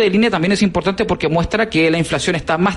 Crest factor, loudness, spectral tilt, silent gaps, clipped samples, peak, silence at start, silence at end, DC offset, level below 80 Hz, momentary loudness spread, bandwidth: 12 dB; -16 LUFS; -5.5 dB/octave; none; under 0.1%; -4 dBFS; 0 s; 0 s; under 0.1%; -36 dBFS; 4 LU; 11.5 kHz